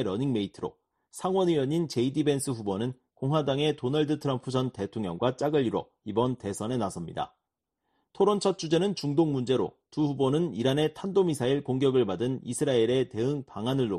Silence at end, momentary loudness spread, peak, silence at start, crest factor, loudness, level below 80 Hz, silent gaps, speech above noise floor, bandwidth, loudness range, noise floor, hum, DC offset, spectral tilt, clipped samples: 0 s; 8 LU; -12 dBFS; 0 s; 16 dB; -28 LUFS; -64 dBFS; none; 57 dB; 13 kHz; 3 LU; -84 dBFS; none; under 0.1%; -6 dB/octave; under 0.1%